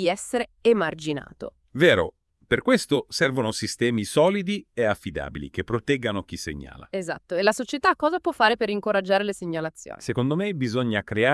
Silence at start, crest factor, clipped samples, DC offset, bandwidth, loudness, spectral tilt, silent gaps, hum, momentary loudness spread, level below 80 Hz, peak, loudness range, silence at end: 0 s; 22 dB; under 0.1%; under 0.1%; 12 kHz; -24 LUFS; -5 dB/octave; none; none; 12 LU; -54 dBFS; -4 dBFS; 4 LU; 0 s